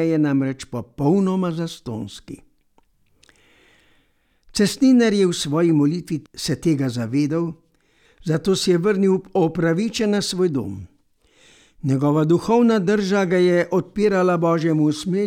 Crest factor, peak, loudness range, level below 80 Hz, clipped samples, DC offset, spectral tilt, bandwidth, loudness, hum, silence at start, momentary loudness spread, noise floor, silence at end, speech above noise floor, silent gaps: 14 dB; -6 dBFS; 7 LU; -54 dBFS; under 0.1%; under 0.1%; -6 dB/octave; 16 kHz; -20 LUFS; none; 0 s; 13 LU; -62 dBFS; 0 s; 43 dB; none